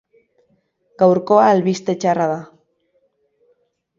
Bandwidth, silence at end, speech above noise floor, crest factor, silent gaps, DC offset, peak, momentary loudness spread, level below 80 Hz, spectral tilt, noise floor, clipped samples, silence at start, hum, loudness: 7.6 kHz; 1.55 s; 49 dB; 18 dB; none; under 0.1%; 0 dBFS; 8 LU; -66 dBFS; -6.5 dB/octave; -64 dBFS; under 0.1%; 1 s; none; -16 LUFS